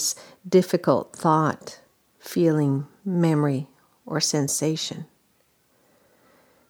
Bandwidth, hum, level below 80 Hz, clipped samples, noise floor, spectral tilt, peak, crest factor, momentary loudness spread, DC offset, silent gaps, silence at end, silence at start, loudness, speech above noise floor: over 20 kHz; none; -72 dBFS; under 0.1%; -65 dBFS; -5 dB/octave; -4 dBFS; 20 dB; 16 LU; under 0.1%; none; 1.65 s; 0 s; -23 LUFS; 42 dB